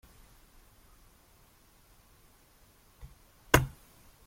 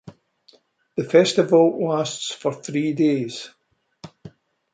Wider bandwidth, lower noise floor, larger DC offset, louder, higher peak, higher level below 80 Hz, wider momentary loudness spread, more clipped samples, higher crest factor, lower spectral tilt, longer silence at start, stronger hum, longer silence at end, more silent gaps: first, 16.5 kHz vs 9.4 kHz; first, -62 dBFS vs -57 dBFS; neither; second, -28 LUFS vs -20 LUFS; about the same, -4 dBFS vs -2 dBFS; first, -50 dBFS vs -68 dBFS; first, 29 LU vs 19 LU; neither; first, 34 dB vs 20 dB; about the same, -4 dB/octave vs -5 dB/octave; first, 3.55 s vs 0.05 s; neither; first, 0.6 s vs 0.45 s; neither